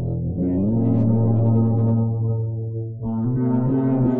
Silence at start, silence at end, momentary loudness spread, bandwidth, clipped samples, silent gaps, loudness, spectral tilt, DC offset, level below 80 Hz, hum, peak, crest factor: 0 s; 0 s; 8 LU; 2.2 kHz; under 0.1%; none; -21 LUFS; -14.5 dB/octave; under 0.1%; -46 dBFS; none; -10 dBFS; 10 dB